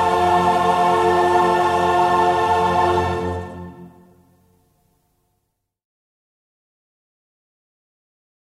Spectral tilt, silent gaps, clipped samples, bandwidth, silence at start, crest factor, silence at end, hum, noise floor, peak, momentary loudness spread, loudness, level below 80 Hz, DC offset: -5.5 dB/octave; none; under 0.1%; 14.5 kHz; 0 s; 16 dB; 4.6 s; none; -74 dBFS; -6 dBFS; 12 LU; -17 LUFS; -48 dBFS; under 0.1%